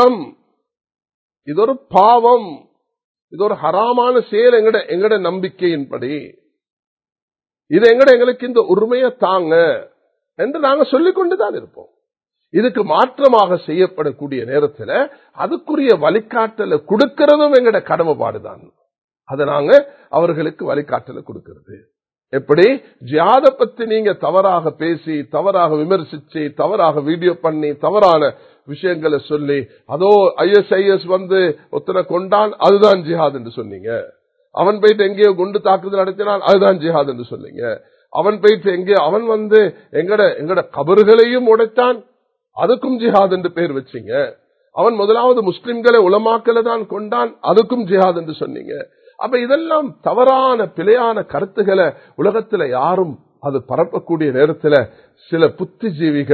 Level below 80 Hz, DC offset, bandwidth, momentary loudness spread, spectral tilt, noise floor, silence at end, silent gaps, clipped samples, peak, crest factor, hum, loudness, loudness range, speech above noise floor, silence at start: -62 dBFS; under 0.1%; 6.6 kHz; 13 LU; -7.5 dB/octave; -76 dBFS; 0 s; 1.14-1.30 s, 3.04-3.15 s, 3.22-3.28 s, 6.72-6.77 s, 6.87-6.97 s, 7.22-7.28 s, 18.98-19.08 s; under 0.1%; 0 dBFS; 14 dB; none; -14 LUFS; 4 LU; 62 dB; 0 s